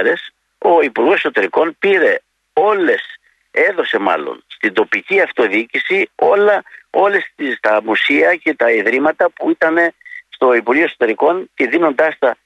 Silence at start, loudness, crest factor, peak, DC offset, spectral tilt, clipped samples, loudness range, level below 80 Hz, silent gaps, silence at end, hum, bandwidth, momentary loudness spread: 0 s; -14 LUFS; 14 dB; -2 dBFS; under 0.1%; -5 dB/octave; under 0.1%; 2 LU; -66 dBFS; none; 0.1 s; none; 9.4 kHz; 7 LU